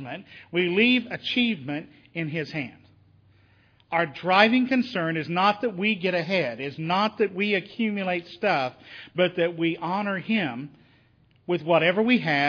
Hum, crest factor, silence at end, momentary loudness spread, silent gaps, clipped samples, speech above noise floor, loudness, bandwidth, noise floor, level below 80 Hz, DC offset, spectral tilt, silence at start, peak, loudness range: none; 22 dB; 0 s; 13 LU; none; under 0.1%; 36 dB; -24 LUFS; 5.4 kHz; -60 dBFS; -72 dBFS; under 0.1%; -7 dB/octave; 0 s; -2 dBFS; 4 LU